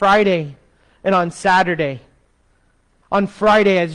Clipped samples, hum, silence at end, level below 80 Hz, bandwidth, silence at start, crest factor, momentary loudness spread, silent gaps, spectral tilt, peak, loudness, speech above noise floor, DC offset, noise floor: under 0.1%; none; 0 s; -50 dBFS; 10.5 kHz; 0 s; 12 dB; 11 LU; none; -5.5 dB/octave; -4 dBFS; -16 LUFS; 43 dB; under 0.1%; -59 dBFS